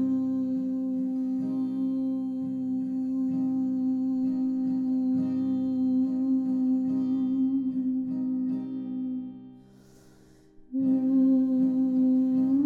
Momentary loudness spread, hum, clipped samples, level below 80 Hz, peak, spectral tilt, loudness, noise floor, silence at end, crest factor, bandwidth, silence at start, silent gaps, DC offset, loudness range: 8 LU; 50 Hz at -60 dBFS; under 0.1%; -68 dBFS; -16 dBFS; -10 dB/octave; -27 LUFS; -55 dBFS; 0 s; 10 dB; 1.9 kHz; 0 s; none; under 0.1%; 4 LU